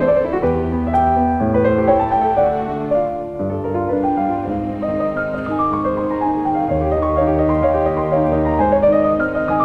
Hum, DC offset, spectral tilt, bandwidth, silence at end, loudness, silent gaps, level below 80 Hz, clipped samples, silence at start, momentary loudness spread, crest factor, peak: none; under 0.1%; -10 dB/octave; 5.8 kHz; 0 s; -17 LUFS; none; -34 dBFS; under 0.1%; 0 s; 7 LU; 14 dB; -2 dBFS